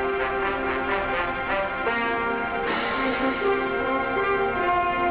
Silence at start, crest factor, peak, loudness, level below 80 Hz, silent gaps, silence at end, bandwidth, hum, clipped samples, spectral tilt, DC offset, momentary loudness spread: 0 s; 12 dB; -12 dBFS; -24 LUFS; -46 dBFS; none; 0 s; 4 kHz; none; under 0.1%; -2 dB/octave; under 0.1%; 3 LU